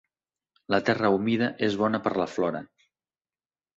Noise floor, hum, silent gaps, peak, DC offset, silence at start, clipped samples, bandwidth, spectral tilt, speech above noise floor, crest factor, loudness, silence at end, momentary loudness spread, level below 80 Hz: under -90 dBFS; none; none; -8 dBFS; under 0.1%; 0.7 s; under 0.1%; 7.8 kHz; -6.5 dB/octave; over 65 dB; 20 dB; -26 LUFS; 1.1 s; 6 LU; -64 dBFS